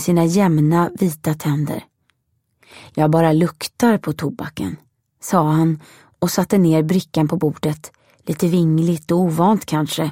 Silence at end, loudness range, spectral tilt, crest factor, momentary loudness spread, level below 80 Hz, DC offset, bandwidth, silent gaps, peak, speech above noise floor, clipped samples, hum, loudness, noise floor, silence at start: 0 s; 2 LU; -6.5 dB/octave; 18 dB; 13 LU; -56 dBFS; under 0.1%; 16.5 kHz; none; -2 dBFS; 51 dB; under 0.1%; none; -18 LUFS; -68 dBFS; 0 s